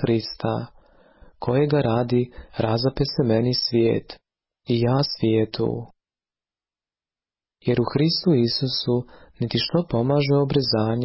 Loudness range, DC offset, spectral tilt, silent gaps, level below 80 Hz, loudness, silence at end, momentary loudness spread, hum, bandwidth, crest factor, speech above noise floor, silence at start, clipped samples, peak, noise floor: 4 LU; under 0.1%; -10 dB/octave; none; -50 dBFS; -22 LUFS; 0 s; 8 LU; none; 5.8 kHz; 14 dB; over 68 dB; 0 s; under 0.1%; -8 dBFS; under -90 dBFS